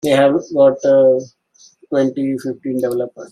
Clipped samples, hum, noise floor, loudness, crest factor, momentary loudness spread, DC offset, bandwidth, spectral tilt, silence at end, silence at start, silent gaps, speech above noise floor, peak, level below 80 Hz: under 0.1%; none; -49 dBFS; -16 LUFS; 14 dB; 10 LU; under 0.1%; 14 kHz; -6 dB/octave; 0.05 s; 0.05 s; none; 34 dB; -2 dBFS; -62 dBFS